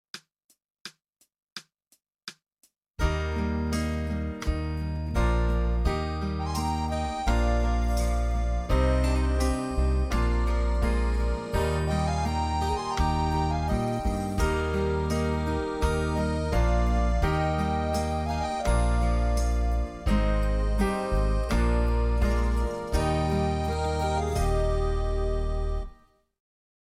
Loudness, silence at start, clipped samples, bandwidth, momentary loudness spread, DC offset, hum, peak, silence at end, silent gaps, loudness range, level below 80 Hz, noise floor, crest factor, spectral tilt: -27 LUFS; 0.15 s; under 0.1%; 14 kHz; 6 LU; under 0.1%; none; -12 dBFS; 0.95 s; 0.44-0.49 s, 0.81-0.85 s, 1.52-1.56 s, 2.90-2.94 s; 3 LU; -28 dBFS; -70 dBFS; 14 dB; -6.5 dB/octave